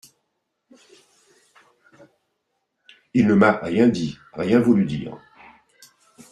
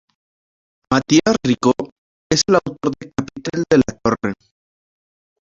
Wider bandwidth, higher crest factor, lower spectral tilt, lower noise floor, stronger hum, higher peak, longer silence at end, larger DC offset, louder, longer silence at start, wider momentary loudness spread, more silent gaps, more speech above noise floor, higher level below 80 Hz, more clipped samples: first, 11.5 kHz vs 7.8 kHz; about the same, 20 dB vs 18 dB; first, -7.5 dB/octave vs -4.5 dB/octave; second, -76 dBFS vs under -90 dBFS; neither; second, -4 dBFS vs 0 dBFS; about the same, 1.15 s vs 1.1 s; neither; about the same, -20 LUFS vs -18 LUFS; first, 3.15 s vs 0.9 s; first, 15 LU vs 12 LU; second, none vs 1.92-2.30 s; second, 57 dB vs over 73 dB; second, -58 dBFS vs -48 dBFS; neither